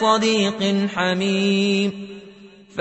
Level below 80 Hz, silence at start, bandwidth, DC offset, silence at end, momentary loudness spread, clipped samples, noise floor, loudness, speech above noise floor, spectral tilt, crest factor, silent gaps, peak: -62 dBFS; 0 s; 8.4 kHz; under 0.1%; 0 s; 17 LU; under 0.1%; -44 dBFS; -20 LUFS; 25 dB; -5 dB/octave; 16 dB; none; -4 dBFS